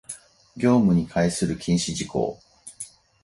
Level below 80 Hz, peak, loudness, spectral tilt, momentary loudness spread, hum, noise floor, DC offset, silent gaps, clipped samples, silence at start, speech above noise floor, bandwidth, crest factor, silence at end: -50 dBFS; -8 dBFS; -23 LUFS; -5.5 dB/octave; 20 LU; none; -43 dBFS; under 0.1%; none; under 0.1%; 0.1 s; 21 dB; 11.5 kHz; 16 dB; 0.35 s